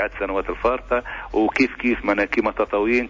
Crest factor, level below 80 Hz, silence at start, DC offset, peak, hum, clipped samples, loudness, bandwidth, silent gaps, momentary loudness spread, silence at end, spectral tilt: 16 dB; -40 dBFS; 0 s; under 0.1%; -6 dBFS; none; under 0.1%; -22 LUFS; 7.6 kHz; none; 5 LU; 0 s; -6 dB/octave